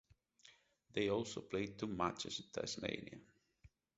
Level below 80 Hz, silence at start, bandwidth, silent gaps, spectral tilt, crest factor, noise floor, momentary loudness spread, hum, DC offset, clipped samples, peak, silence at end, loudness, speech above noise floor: -70 dBFS; 0.45 s; 8 kHz; none; -3.5 dB/octave; 24 dB; -69 dBFS; 9 LU; none; under 0.1%; under 0.1%; -22 dBFS; 0.3 s; -42 LUFS; 27 dB